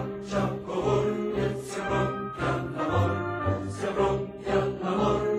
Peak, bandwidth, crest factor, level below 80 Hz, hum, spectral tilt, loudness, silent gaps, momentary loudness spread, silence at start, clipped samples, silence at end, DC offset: -12 dBFS; 12.5 kHz; 16 dB; -48 dBFS; none; -7 dB/octave; -28 LUFS; none; 5 LU; 0 s; under 0.1%; 0 s; under 0.1%